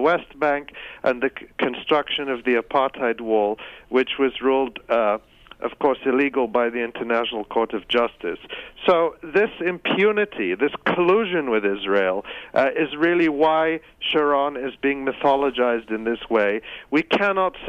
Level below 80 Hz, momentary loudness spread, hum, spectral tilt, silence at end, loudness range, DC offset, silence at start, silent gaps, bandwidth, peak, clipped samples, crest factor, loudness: -56 dBFS; 7 LU; none; -6.5 dB/octave; 0 s; 2 LU; under 0.1%; 0 s; none; 7.2 kHz; -6 dBFS; under 0.1%; 14 dB; -22 LUFS